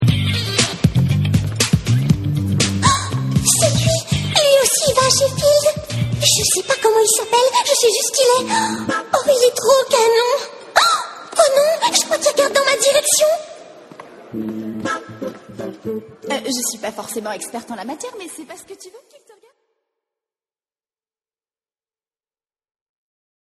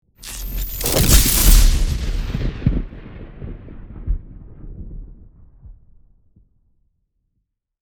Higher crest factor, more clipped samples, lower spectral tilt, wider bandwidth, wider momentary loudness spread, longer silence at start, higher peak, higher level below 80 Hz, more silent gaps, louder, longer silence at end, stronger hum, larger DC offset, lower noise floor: about the same, 18 dB vs 20 dB; neither; about the same, -3.5 dB/octave vs -3.5 dB/octave; second, 13 kHz vs over 20 kHz; second, 15 LU vs 25 LU; second, 0 s vs 0.2 s; about the same, 0 dBFS vs 0 dBFS; second, -42 dBFS vs -22 dBFS; neither; about the same, -16 LUFS vs -18 LUFS; first, 4.6 s vs 2.1 s; neither; neither; first, under -90 dBFS vs -73 dBFS